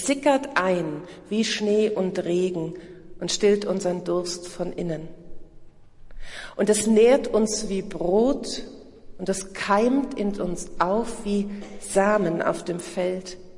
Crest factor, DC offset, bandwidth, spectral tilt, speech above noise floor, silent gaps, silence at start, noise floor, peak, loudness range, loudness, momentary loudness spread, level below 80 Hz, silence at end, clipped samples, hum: 18 dB; under 0.1%; 11.5 kHz; -4.5 dB/octave; 21 dB; none; 0 s; -45 dBFS; -6 dBFS; 4 LU; -24 LUFS; 13 LU; -46 dBFS; 0 s; under 0.1%; none